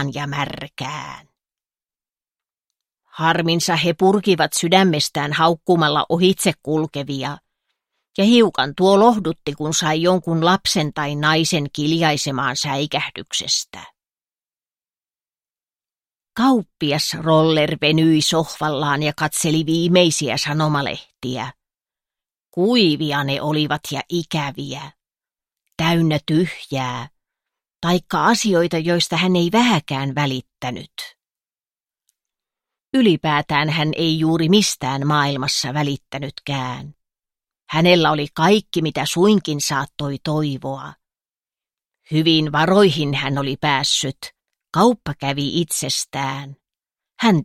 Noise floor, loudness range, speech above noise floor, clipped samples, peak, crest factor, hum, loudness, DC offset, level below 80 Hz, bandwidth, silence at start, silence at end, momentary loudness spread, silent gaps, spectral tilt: under -90 dBFS; 6 LU; over 72 dB; under 0.1%; 0 dBFS; 20 dB; none; -18 LUFS; under 0.1%; -56 dBFS; 16 kHz; 0 s; 0 s; 13 LU; none; -4.5 dB/octave